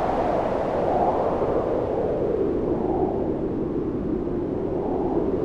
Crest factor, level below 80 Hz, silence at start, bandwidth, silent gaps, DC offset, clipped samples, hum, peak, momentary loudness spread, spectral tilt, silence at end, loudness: 14 dB; -40 dBFS; 0 s; 8 kHz; none; under 0.1%; under 0.1%; none; -10 dBFS; 4 LU; -9.5 dB/octave; 0 s; -24 LUFS